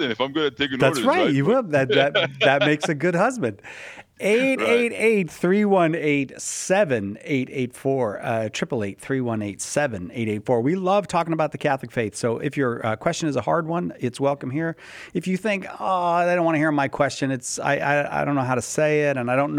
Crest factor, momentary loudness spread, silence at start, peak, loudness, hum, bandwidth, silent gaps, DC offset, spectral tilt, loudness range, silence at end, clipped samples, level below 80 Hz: 18 dB; 8 LU; 0 s; -4 dBFS; -22 LUFS; none; 16 kHz; none; under 0.1%; -5 dB/octave; 5 LU; 0 s; under 0.1%; -62 dBFS